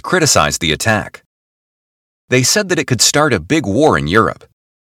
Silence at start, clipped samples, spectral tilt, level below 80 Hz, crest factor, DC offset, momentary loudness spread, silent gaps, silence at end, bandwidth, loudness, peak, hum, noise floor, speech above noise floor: 0.05 s; under 0.1%; -3.5 dB/octave; -40 dBFS; 16 dB; under 0.1%; 6 LU; 1.26-2.28 s; 0.5 s; 18 kHz; -13 LUFS; 0 dBFS; none; under -90 dBFS; over 76 dB